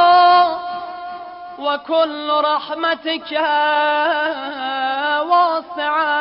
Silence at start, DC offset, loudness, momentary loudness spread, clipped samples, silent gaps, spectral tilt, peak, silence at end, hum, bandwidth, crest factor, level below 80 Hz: 0 s; under 0.1%; -17 LUFS; 13 LU; under 0.1%; none; -7 dB/octave; -4 dBFS; 0 s; none; 5.6 kHz; 12 dB; -64 dBFS